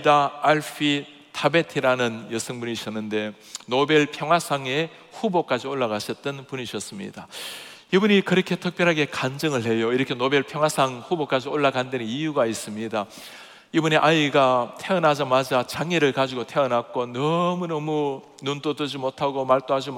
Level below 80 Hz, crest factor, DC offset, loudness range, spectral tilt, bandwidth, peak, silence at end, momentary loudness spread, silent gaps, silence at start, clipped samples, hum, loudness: -70 dBFS; 20 dB; under 0.1%; 4 LU; -5 dB/octave; 17.5 kHz; -2 dBFS; 0 s; 12 LU; none; 0 s; under 0.1%; none; -23 LUFS